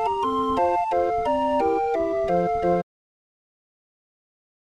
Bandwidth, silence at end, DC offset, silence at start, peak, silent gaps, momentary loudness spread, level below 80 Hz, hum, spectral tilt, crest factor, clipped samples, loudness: 11 kHz; 1.95 s; under 0.1%; 0 s; -10 dBFS; none; 2 LU; -50 dBFS; none; -7 dB/octave; 14 dB; under 0.1%; -23 LUFS